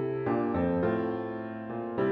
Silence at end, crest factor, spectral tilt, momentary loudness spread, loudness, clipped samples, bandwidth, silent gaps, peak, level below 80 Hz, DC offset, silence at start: 0 s; 14 dB; -10.5 dB/octave; 9 LU; -31 LUFS; under 0.1%; 5.2 kHz; none; -16 dBFS; -60 dBFS; under 0.1%; 0 s